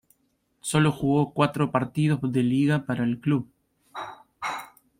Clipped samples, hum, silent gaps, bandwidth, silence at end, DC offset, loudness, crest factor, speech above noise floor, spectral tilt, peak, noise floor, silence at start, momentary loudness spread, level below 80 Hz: under 0.1%; none; none; 15.5 kHz; 0.35 s; under 0.1%; -25 LUFS; 18 dB; 47 dB; -6.5 dB/octave; -6 dBFS; -71 dBFS; 0.65 s; 16 LU; -58 dBFS